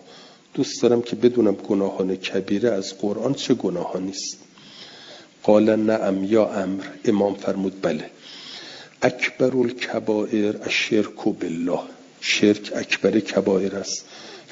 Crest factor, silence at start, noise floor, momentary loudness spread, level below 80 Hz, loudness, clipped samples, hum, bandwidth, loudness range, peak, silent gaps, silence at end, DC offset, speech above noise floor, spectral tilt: 20 dB; 0.1 s; -47 dBFS; 17 LU; -66 dBFS; -22 LUFS; under 0.1%; none; 7.8 kHz; 3 LU; -2 dBFS; none; 0.1 s; under 0.1%; 25 dB; -5 dB/octave